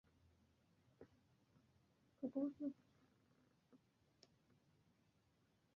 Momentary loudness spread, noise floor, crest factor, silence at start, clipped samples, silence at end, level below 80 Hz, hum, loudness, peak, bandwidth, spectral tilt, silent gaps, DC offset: 23 LU; -80 dBFS; 22 dB; 1 s; under 0.1%; 2 s; -88 dBFS; none; -48 LUFS; -34 dBFS; 6.8 kHz; -8 dB/octave; none; under 0.1%